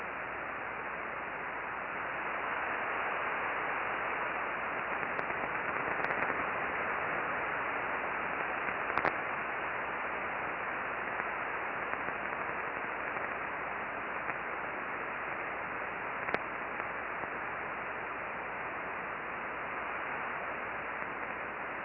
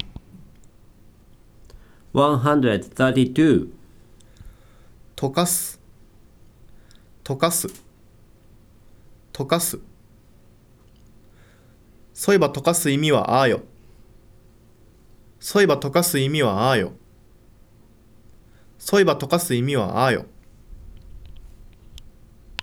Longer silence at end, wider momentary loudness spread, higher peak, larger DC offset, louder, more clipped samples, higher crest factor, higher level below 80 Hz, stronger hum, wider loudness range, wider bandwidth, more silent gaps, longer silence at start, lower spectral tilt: second, 0 s vs 1 s; second, 5 LU vs 15 LU; second, -14 dBFS vs -4 dBFS; neither; second, -36 LUFS vs -20 LUFS; neither; about the same, 22 dB vs 20 dB; second, -64 dBFS vs -50 dBFS; neither; second, 4 LU vs 8 LU; second, 5.4 kHz vs over 20 kHz; neither; about the same, 0 s vs 0 s; second, -2 dB/octave vs -4.5 dB/octave